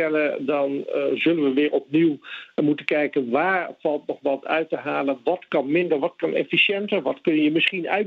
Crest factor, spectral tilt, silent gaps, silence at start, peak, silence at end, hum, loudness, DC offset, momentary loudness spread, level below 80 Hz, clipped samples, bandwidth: 18 dB; -7 dB/octave; none; 0 s; -4 dBFS; 0 s; none; -22 LUFS; under 0.1%; 7 LU; -78 dBFS; under 0.1%; 5 kHz